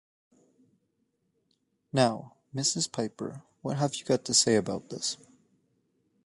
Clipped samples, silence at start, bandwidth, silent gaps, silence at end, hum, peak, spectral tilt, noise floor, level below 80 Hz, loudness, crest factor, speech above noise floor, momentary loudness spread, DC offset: under 0.1%; 1.95 s; 11.5 kHz; none; 1.1 s; none; -8 dBFS; -3.5 dB/octave; -76 dBFS; -70 dBFS; -28 LUFS; 24 dB; 47 dB; 17 LU; under 0.1%